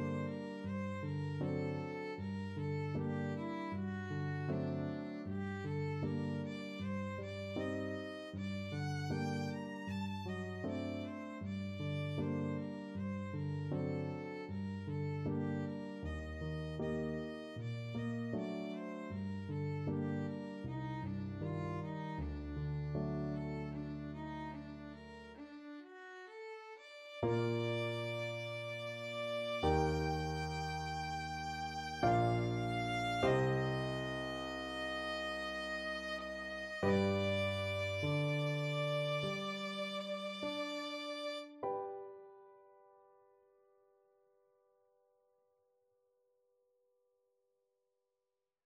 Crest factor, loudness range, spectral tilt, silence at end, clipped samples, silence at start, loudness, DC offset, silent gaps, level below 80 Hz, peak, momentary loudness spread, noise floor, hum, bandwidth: 20 dB; 7 LU; -6.5 dB/octave; 5.8 s; under 0.1%; 0 s; -40 LUFS; under 0.1%; none; -58 dBFS; -20 dBFS; 9 LU; -90 dBFS; none; 12.5 kHz